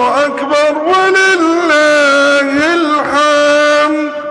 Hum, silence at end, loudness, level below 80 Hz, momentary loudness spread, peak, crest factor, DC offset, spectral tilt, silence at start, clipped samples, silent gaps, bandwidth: none; 0 s; -10 LUFS; -52 dBFS; 4 LU; -2 dBFS; 8 dB; under 0.1%; -2.5 dB/octave; 0 s; under 0.1%; none; 10.5 kHz